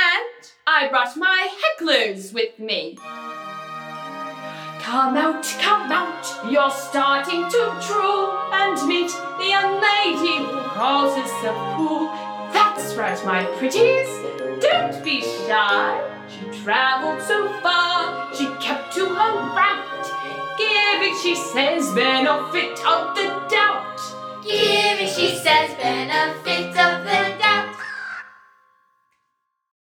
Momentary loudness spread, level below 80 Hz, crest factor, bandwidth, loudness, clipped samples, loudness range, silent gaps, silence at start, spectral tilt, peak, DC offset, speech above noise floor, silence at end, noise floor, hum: 13 LU; -74 dBFS; 20 dB; 19 kHz; -20 LUFS; under 0.1%; 3 LU; none; 0 s; -2.5 dB/octave; -2 dBFS; under 0.1%; 53 dB; 1.65 s; -74 dBFS; none